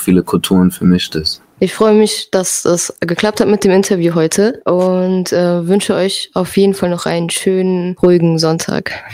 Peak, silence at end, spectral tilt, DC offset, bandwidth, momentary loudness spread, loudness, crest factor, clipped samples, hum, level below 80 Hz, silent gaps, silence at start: 0 dBFS; 0 s; -5 dB/octave; under 0.1%; 16 kHz; 6 LU; -13 LUFS; 12 dB; under 0.1%; none; -46 dBFS; none; 0 s